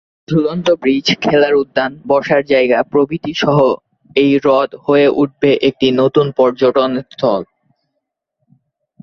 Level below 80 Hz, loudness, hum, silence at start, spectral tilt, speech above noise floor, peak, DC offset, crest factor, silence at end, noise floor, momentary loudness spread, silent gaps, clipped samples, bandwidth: -52 dBFS; -14 LUFS; none; 0.3 s; -6 dB/octave; 61 dB; -2 dBFS; under 0.1%; 12 dB; 1.6 s; -74 dBFS; 6 LU; none; under 0.1%; 7 kHz